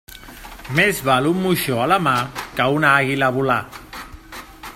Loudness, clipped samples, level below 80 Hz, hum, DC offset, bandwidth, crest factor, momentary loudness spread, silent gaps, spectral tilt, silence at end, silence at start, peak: -18 LUFS; under 0.1%; -46 dBFS; none; under 0.1%; 16.5 kHz; 20 dB; 21 LU; none; -5 dB/octave; 0 s; 0.1 s; 0 dBFS